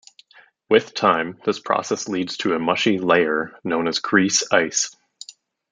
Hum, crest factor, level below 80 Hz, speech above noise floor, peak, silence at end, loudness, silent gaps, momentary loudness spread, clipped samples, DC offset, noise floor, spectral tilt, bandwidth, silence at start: none; 20 dB; -66 dBFS; 33 dB; -2 dBFS; 0.4 s; -20 LUFS; none; 9 LU; under 0.1%; under 0.1%; -53 dBFS; -3 dB/octave; 10 kHz; 0.7 s